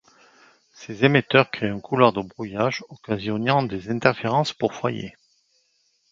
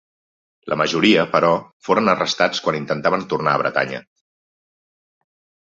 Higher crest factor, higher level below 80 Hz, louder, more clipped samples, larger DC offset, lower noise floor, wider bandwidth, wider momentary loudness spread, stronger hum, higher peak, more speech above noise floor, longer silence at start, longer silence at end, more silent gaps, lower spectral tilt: about the same, 24 dB vs 20 dB; about the same, -58 dBFS vs -60 dBFS; second, -22 LUFS vs -19 LUFS; neither; neither; second, -67 dBFS vs under -90 dBFS; about the same, 7.6 kHz vs 7.8 kHz; first, 13 LU vs 8 LU; neither; about the same, 0 dBFS vs -2 dBFS; second, 45 dB vs over 71 dB; first, 0.8 s vs 0.65 s; second, 1 s vs 1.65 s; second, none vs 1.73-1.80 s; first, -6.5 dB/octave vs -4.5 dB/octave